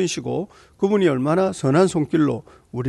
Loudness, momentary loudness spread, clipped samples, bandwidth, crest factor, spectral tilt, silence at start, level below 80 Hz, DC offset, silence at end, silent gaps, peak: -20 LUFS; 12 LU; under 0.1%; 12 kHz; 14 dB; -6 dB/octave; 0 s; -56 dBFS; under 0.1%; 0 s; none; -6 dBFS